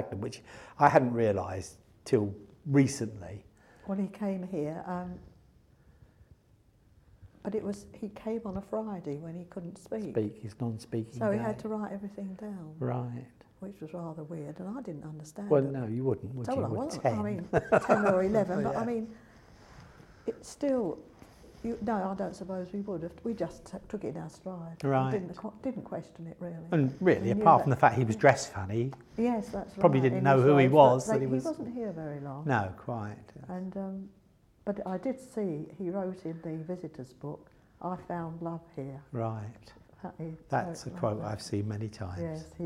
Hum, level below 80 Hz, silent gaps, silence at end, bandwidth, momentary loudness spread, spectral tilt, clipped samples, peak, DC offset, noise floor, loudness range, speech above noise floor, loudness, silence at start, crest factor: none; -62 dBFS; none; 0 s; 13 kHz; 18 LU; -7 dB/octave; under 0.1%; -6 dBFS; under 0.1%; -64 dBFS; 14 LU; 33 dB; -31 LUFS; 0 s; 26 dB